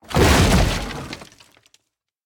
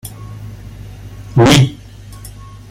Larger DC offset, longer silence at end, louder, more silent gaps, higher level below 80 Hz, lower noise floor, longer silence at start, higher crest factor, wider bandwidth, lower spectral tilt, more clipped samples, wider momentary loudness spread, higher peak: neither; about the same, 1 s vs 0.95 s; second, -17 LUFS vs -11 LUFS; neither; first, -26 dBFS vs -36 dBFS; first, -71 dBFS vs -34 dBFS; about the same, 0.1 s vs 0.05 s; about the same, 18 dB vs 16 dB; first, 19.5 kHz vs 16 kHz; about the same, -4.5 dB/octave vs -5.5 dB/octave; neither; second, 20 LU vs 26 LU; about the same, -2 dBFS vs 0 dBFS